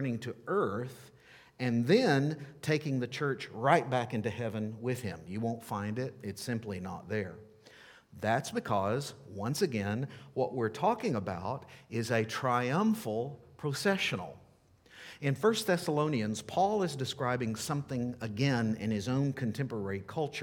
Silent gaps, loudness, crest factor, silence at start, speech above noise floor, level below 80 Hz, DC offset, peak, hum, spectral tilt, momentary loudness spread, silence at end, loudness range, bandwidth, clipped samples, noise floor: none; -33 LUFS; 24 dB; 0 s; 30 dB; -70 dBFS; under 0.1%; -8 dBFS; none; -6 dB/octave; 11 LU; 0 s; 6 LU; 18.5 kHz; under 0.1%; -62 dBFS